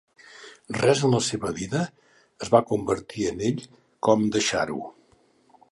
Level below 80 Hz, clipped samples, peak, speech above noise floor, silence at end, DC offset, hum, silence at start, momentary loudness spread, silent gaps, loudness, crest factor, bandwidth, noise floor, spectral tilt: -56 dBFS; under 0.1%; -2 dBFS; 37 dB; 0.8 s; under 0.1%; none; 0.4 s; 15 LU; none; -25 LUFS; 22 dB; 11.5 kHz; -61 dBFS; -5 dB/octave